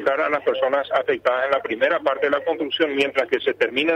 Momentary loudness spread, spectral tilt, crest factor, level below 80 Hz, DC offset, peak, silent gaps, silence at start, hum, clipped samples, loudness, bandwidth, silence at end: 2 LU; -4.5 dB/octave; 14 dB; -66 dBFS; under 0.1%; -8 dBFS; none; 0 s; none; under 0.1%; -21 LUFS; 9.2 kHz; 0 s